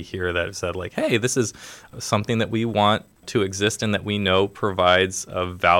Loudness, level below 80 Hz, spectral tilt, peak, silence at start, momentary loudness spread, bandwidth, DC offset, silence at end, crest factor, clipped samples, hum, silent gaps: -22 LUFS; -52 dBFS; -4 dB/octave; -4 dBFS; 0 s; 9 LU; 17 kHz; under 0.1%; 0 s; 18 dB; under 0.1%; none; none